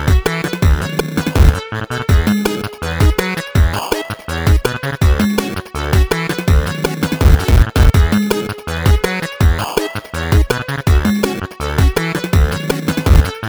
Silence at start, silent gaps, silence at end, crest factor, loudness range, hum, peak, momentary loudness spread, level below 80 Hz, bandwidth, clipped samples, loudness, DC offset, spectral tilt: 0 s; none; 0 s; 14 dB; 2 LU; none; 0 dBFS; 7 LU; -16 dBFS; over 20 kHz; under 0.1%; -16 LUFS; under 0.1%; -6 dB/octave